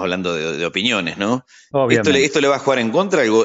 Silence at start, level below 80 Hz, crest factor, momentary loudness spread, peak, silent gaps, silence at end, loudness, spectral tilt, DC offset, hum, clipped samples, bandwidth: 0 s; -60 dBFS; 16 dB; 7 LU; -2 dBFS; none; 0 s; -17 LUFS; -4.5 dB/octave; under 0.1%; none; under 0.1%; 8 kHz